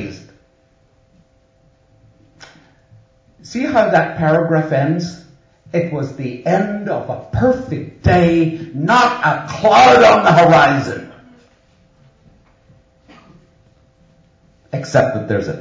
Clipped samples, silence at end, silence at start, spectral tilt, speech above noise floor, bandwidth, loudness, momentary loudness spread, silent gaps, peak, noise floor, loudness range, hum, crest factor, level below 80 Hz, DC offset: under 0.1%; 0 s; 0 s; -6 dB/octave; 42 dB; 7.8 kHz; -14 LUFS; 15 LU; none; 0 dBFS; -55 dBFS; 11 LU; none; 16 dB; -40 dBFS; under 0.1%